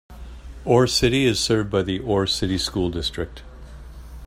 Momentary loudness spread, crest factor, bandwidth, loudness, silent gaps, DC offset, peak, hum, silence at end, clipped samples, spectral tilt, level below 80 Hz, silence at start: 24 LU; 20 dB; 16 kHz; -21 LUFS; none; under 0.1%; -2 dBFS; none; 0 s; under 0.1%; -4.5 dB/octave; -38 dBFS; 0.1 s